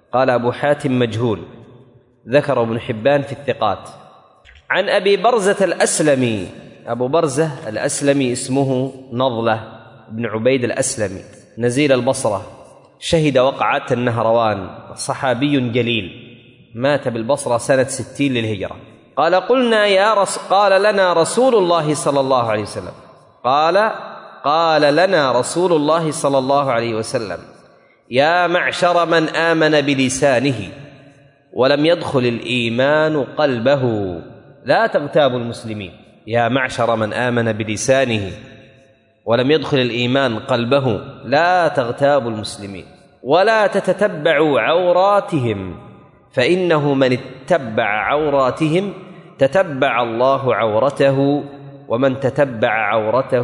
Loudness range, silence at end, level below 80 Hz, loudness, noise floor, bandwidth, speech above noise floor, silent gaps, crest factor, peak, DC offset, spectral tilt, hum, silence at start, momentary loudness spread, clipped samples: 4 LU; 0 s; -56 dBFS; -17 LUFS; -52 dBFS; 11 kHz; 36 dB; none; 16 dB; -2 dBFS; under 0.1%; -5 dB/octave; none; 0.15 s; 12 LU; under 0.1%